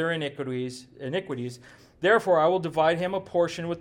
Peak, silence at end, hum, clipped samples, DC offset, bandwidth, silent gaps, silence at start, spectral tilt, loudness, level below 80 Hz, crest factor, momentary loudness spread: -10 dBFS; 0 s; none; under 0.1%; under 0.1%; 16 kHz; none; 0 s; -5.5 dB/octave; -26 LUFS; -64 dBFS; 16 dB; 13 LU